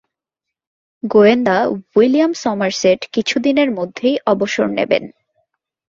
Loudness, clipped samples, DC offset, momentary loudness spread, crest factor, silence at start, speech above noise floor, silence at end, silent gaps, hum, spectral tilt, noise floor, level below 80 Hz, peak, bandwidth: -15 LUFS; under 0.1%; under 0.1%; 7 LU; 16 dB; 1.05 s; 68 dB; 0.85 s; none; none; -5 dB/octave; -83 dBFS; -60 dBFS; 0 dBFS; 7.6 kHz